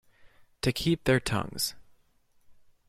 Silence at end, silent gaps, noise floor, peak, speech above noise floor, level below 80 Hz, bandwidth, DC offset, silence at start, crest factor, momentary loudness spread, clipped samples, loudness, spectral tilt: 0.35 s; none; -65 dBFS; -12 dBFS; 37 dB; -50 dBFS; 16.5 kHz; under 0.1%; 0.25 s; 20 dB; 6 LU; under 0.1%; -29 LUFS; -4.5 dB/octave